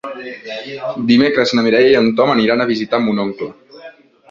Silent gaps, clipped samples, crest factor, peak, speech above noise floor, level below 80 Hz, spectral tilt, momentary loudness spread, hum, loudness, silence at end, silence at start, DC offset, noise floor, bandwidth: none; under 0.1%; 14 dB; -2 dBFS; 25 dB; -56 dBFS; -6 dB/octave; 16 LU; none; -14 LUFS; 0.4 s; 0.05 s; under 0.1%; -40 dBFS; 7.6 kHz